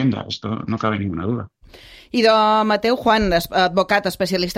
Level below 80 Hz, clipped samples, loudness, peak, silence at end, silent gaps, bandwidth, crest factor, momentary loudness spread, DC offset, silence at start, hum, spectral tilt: -42 dBFS; under 0.1%; -19 LUFS; -2 dBFS; 0 s; none; 16 kHz; 16 dB; 11 LU; under 0.1%; 0 s; none; -5.5 dB/octave